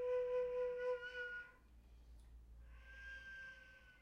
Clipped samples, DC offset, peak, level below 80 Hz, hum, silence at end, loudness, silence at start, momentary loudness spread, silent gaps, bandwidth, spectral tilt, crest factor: under 0.1%; under 0.1%; -34 dBFS; -64 dBFS; none; 0 s; -45 LUFS; 0 s; 23 LU; none; 6.8 kHz; -4.5 dB/octave; 14 dB